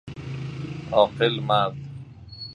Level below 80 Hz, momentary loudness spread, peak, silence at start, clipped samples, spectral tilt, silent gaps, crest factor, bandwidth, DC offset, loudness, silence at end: -52 dBFS; 19 LU; -4 dBFS; 0.05 s; under 0.1%; -7 dB/octave; none; 22 dB; 10 kHz; under 0.1%; -24 LUFS; 0 s